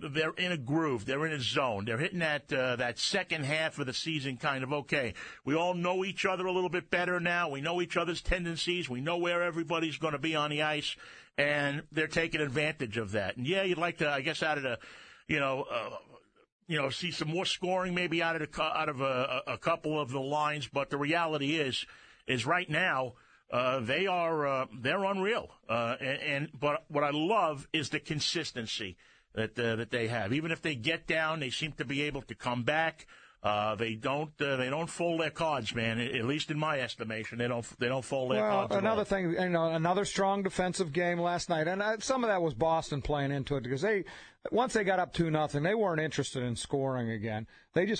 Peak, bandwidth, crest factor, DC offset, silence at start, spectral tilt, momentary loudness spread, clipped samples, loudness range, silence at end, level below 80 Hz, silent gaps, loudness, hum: -12 dBFS; 9.4 kHz; 20 dB; under 0.1%; 0 s; -4.5 dB/octave; 5 LU; under 0.1%; 2 LU; 0 s; -56 dBFS; 16.52-16.59 s; -32 LUFS; none